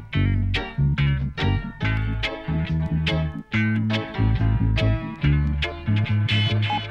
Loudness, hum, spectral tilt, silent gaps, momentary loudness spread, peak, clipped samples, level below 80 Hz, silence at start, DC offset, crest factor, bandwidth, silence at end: -23 LUFS; none; -7.5 dB/octave; none; 4 LU; -8 dBFS; under 0.1%; -30 dBFS; 0 s; under 0.1%; 14 dB; 7 kHz; 0 s